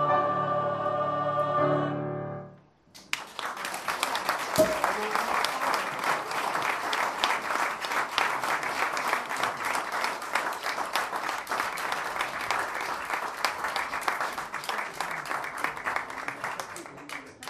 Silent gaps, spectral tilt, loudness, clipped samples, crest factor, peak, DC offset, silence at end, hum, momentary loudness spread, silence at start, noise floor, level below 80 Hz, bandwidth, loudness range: none; -3 dB/octave; -29 LUFS; under 0.1%; 26 dB; -4 dBFS; under 0.1%; 0 s; none; 8 LU; 0 s; -54 dBFS; -64 dBFS; 15 kHz; 3 LU